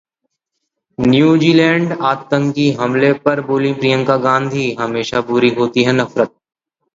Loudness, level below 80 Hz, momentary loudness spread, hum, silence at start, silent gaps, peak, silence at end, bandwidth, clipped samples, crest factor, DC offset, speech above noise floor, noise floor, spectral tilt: -14 LUFS; -52 dBFS; 8 LU; none; 1 s; none; 0 dBFS; 0.65 s; 7.8 kHz; under 0.1%; 14 dB; under 0.1%; 61 dB; -75 dBFS; -6.5 dB/octave